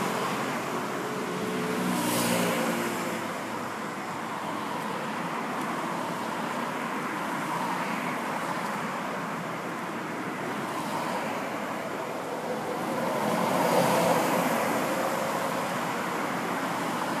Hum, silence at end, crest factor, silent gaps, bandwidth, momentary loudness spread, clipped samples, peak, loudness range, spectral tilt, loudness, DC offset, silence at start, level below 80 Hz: none; 0 s; 20 dB; none; 15.5 kHz; 8 LU; under 0.1%; -10 dBFS; 6 LU; -4 dB/octave; -29 LUFS; under 0.1%; 0 s; -70 dBFS